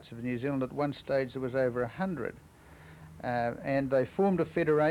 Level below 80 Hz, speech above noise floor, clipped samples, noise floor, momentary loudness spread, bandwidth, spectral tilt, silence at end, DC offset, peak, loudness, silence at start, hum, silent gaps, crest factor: -60 dBFS; 23 dB; under 0.1%; -53 dBFS; 10 LU; 13.5 kHz; -8.5 dB/octave; 0 s; under 0.1%; -16 dBFS; -31 LUFS; 0 s; none; none; 14 dB